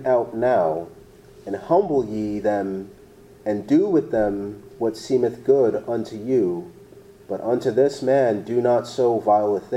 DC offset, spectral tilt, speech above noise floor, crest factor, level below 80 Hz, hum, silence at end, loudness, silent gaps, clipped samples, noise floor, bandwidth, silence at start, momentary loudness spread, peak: under 0.1%; -7 dB/octave; 26 dB; 16 dB; -56 dBFS; none; 0 s; -22 LUFS; none; under 0.1%; -47 dBFS; 12.5 kHz; 0 s; 13 LU; -6 dBFS